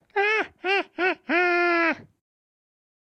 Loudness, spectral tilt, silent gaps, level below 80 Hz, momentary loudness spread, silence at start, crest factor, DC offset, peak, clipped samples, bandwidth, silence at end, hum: -23 LUFS; -3.5 dB/octave; none; -72 dBFS; 5 LU; 0.15 s; 16 dB; under 0.1%; -10 dBFS; under 0.1%; 8.6 kHz; 1.15 s; none